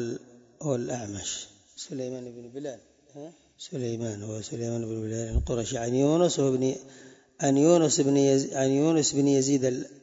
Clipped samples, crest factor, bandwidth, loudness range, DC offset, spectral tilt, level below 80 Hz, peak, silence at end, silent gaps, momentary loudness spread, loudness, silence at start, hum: under 0.1%; 18 dB; 8 kHz; 13 LU; under 0.1%; -5 dB/octave; -44 dBFS; -8 dBFS; 0.1 s; none; 18 LU; -26 LUFS; 0 s; none